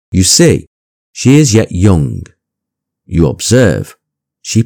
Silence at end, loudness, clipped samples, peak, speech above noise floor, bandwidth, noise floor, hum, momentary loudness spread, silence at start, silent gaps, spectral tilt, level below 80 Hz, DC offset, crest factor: 0 s; -10 LUFS; 1%; 0 dBFS; 69 dB; over 20 kHz; -78 dBFS; none; 13 LU; 0.1 s; 0.67-1.14 s; -5 dB/octave; -32 dBFS; under 0.1%; 12 dB